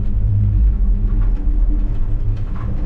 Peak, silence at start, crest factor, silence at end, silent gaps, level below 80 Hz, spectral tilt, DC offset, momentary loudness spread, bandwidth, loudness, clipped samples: -6 dBFS; 0 s; 8 dB; 0 s; none; -16 dBFS; -11 dB/octave; under 0.1%; 7 LU; 2.6 kHz; -20 LUFS; under 0.1%